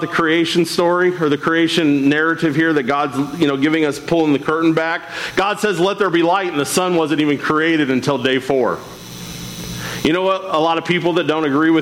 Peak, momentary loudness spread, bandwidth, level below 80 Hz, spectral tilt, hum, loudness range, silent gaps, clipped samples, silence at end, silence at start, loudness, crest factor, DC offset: -6 dBFS; 7 LU; 16.5 kHz; -52 dBFS; -5 dB/octave; none; 3 LU; none; under 0.1%; 0 s; 0 s; -16 LUFS; 12 dB; under 0.1%